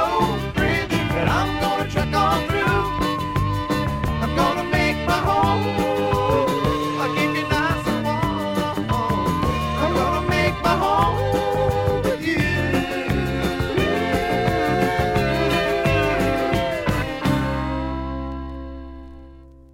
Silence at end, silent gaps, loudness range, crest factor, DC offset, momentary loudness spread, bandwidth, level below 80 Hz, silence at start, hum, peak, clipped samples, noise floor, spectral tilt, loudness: 0.1 s; none; 1 LU; 16 dB; under 0.1%; 4 LU; 17 kHz; -34 dBFS; 0 s; none; -4 dBFS; under 0.1%; -43 dBFS; -6 dB/octave; -21 LUFS